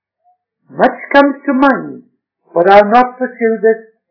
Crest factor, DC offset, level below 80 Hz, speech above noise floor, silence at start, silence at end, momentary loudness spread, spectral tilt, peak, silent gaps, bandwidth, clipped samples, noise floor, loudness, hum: 12 dB; under 0.1%; -50 dBFS; 48 dB; 0.75 s; 0.3 s; 13 LU; -7 dB/octave; 0 dBFS; none; 5.4 kHz; 2%; -58 dBFS; -11 LUFS; none